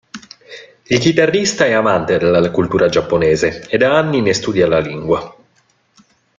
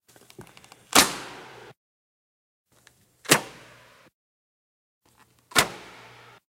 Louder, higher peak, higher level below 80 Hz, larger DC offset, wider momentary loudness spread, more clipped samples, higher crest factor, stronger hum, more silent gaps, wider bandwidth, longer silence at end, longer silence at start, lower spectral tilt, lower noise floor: first, -14 LUFS vs -22 LUFS; about the same, 0 dBFS vs -2 dBFS; first, -46 dBFS vs -60 dBFS; neither; second, 7 LU vs 25 LU; neither; second, 14 dB vs 30 dB; neither; second, none vs 1.77-2.65 s, 4.14-5.01 s; second, 9.2 kHz vs 16.5 kHz; first, 1.05 s vs 0.75 s; second, 0.15 s vs 0.4 s; first, -5 dB/octave vs -1.5 dB/octave; about the same, -58 dBFS vs -61 dBFS